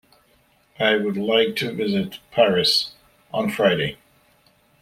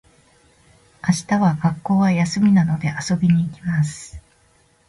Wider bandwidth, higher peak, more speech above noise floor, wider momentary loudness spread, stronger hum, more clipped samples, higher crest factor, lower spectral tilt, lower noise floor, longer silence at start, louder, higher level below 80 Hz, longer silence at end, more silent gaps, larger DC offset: first, 16 kHz vs 11.5 kHz; about the same, -4 dBFS vs -6 dBFS; about the same, 39 dB vs 39 dB; about the same, 9 LU vs 9 LU; neither; neither; first, 20 dB vs 14 dB; second, -4.5 dB/octave vs -6.5 dB/octave; about the same, -60 dBFS vs -58 dBFS; second, 0.8 s vs 1.05 s; about the same, -21 LUFS vs -19 LUFS; second, -60 dBFS vs -50 dBFS; first, 0.85 s vs 0.7 s; neither; neither